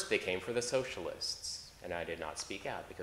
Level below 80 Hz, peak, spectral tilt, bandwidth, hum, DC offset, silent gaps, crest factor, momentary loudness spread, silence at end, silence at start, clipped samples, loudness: -64 dBFS; -16 dBFS; -2.5 dB/octave; 16 kHz; none; under 0.1%; none; 22 dB; 8 LU; 0 s; 0 s; under 0.1%; -38 LUFS